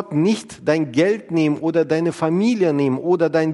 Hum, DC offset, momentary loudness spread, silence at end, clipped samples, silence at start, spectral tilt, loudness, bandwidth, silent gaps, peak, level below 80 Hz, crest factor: none; under 0.1%; 3 LU; 0 s; under 0.1%; 0 s; -7 dB/octave; -19 LUFS; 11.5 kHz; none; -4 dBFS; -64 dBFS; 14 dB